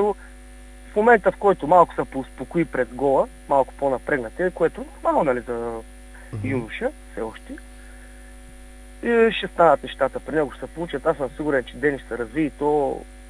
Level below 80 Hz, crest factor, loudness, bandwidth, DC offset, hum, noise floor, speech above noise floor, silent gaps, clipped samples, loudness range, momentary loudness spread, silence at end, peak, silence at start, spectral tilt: -44 dBFS; 22 dB; -22 LUFS; 11 kHz; under 0.1%; none; -42 dBFS; 20 dB; none; under 0.1%; 8 LU; 15 LU; 0 s; -2 dBFS; 0 s; -6.5 dB/octave